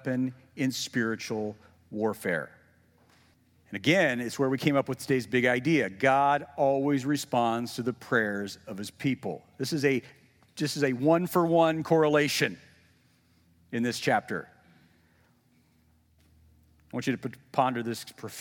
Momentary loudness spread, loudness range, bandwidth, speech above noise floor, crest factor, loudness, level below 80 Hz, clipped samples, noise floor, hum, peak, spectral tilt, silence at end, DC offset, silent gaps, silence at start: 14 LU; 9 LU; 18 kHz; 38 dB; 20 dB; -28 LUFS; -74 dBFS; under 0.1%; -65 dBFS; none; -10 dBFS; -5 dB/octave; 0 s; under 0.1%; none; 0.05 s